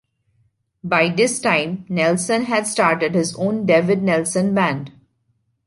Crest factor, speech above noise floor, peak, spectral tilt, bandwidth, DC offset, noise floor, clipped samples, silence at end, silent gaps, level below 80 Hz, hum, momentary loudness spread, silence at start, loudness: 18 dB; 49 dB; -2 dBFS; -4.5 dB/octave; 11.5 kHz; under 0.1%; -67 dBFS; under 0.1%; 0.8 s; none; -60 dBFS; none; 5 LU; 0.85 s; -18 LUFS